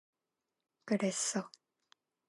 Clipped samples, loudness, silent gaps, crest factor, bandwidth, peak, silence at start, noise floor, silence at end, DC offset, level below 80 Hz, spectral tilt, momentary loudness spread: under 0.1%; -35 LUFS; none; 20 dB; 11.5 kHz; -20 dBFS; 0.85 s; -89 dBFS; 0.8 s; under 0.1%; under -90 dBFS; -3.5 dB/octave; 19 LU